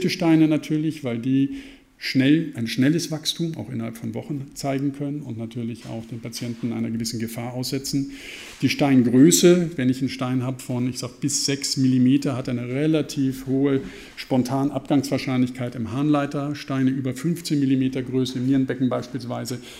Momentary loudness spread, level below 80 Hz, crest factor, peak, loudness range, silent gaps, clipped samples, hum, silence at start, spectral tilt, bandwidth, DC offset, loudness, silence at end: 13 LU; -56 dBFS; 20 dB; -2 dBFS; 9 LU; none; under 0.1%; none; 0 s; -5.5 dB/octave; 16 kHz; under 0.1%; -23 LUFS; 0 s